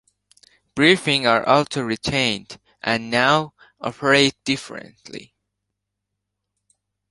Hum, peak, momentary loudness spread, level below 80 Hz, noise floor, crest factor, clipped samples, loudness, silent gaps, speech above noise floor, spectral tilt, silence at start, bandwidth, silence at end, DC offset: 50 Hz at -60 dBFS; 0 dBFS; 20 LU; -56 dBFS; -80 dBFS; 22 dB; under 0.1%; -19 LUFS; none; 60 dB; -4 dB/octave; 0.75 s; 11.5 kHz; 1.85 s; under 0.1%